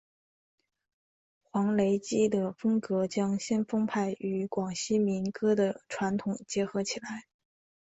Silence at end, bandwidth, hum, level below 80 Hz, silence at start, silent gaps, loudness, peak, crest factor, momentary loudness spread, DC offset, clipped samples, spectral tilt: 0.7 s; 8.2 kHz; none; -68 dBFS; 1.55 s; none; -30 LUFS; -16 dBFS; 16 dB; 6 LU; under 0.1%; under 0.1%; -5.5 dB/octave